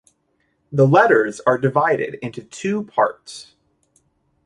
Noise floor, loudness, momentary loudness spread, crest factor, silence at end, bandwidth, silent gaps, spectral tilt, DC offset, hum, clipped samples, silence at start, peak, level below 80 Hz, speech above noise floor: -67 dBFS; -18 LUFS; 18 LU; 18 dB; 1.05 s; 11 kHz; none; -6.5 dB/octave; under 0.1%; none; under 0.1%; 0.7 s; -2 dBFS; -62 dBFS; 49 dB